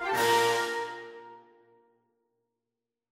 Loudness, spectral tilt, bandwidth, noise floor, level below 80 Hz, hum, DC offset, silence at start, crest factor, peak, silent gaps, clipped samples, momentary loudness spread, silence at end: -27 LUFS; -2 dB/octave; 16 kHz; -89 dBFS; -72 dBFS; none; under 0.1%; 0 s; 20 dB; -12 dBFS; none; under 0.1%; 22 LU; 1.75 s